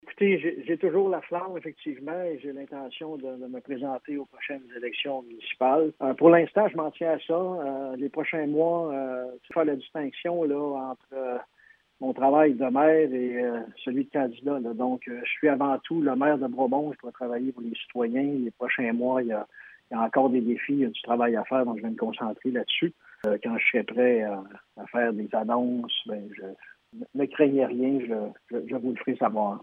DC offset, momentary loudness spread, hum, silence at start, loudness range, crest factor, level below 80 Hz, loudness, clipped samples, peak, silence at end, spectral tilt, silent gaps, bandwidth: under 0.1%; 14 LU; none; 0.05 s; 6 LU; 22 dB; -80 dBFS; -27 LUFS; under 0.1%; -6 dBFS; 0 s; -8.5 dB/octave; none; 3.9 kHz